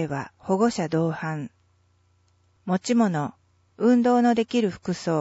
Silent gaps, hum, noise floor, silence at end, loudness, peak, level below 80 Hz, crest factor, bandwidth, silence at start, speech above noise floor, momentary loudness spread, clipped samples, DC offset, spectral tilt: none; 60 Hz at -45 dBFS; -64 dBFS; 0 s; -24 LUFS; -8 dBFS; -64 dBFS; 16 dB; 8 kHz; 0 s; 41 dB; 13 LU; under 0.1%; under 0.1%; -6.5 dB/octave